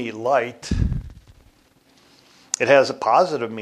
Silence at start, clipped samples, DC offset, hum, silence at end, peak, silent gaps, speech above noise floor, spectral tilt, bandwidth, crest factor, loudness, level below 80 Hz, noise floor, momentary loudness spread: 0 s; under 0.1%; under 0.1%; none; 0 s; 0 dBFS; none; 38 dB; -4.5 dB/octave; 12 kHz; 22 dB; -20 LUFS; -34 dBFS; -57 dBFS; 11 LU